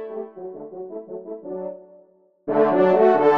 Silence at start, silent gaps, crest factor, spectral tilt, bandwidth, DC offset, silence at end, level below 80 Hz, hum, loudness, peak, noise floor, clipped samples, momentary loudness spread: 0 s; none; 16 dB; -8.5 dB/octave; 6 kHz; under 0.1%; 0 s; -70 dBFS; none; -19 LUFS; -4 dBFS; -56 dBFS; under 0.1%; 20 LU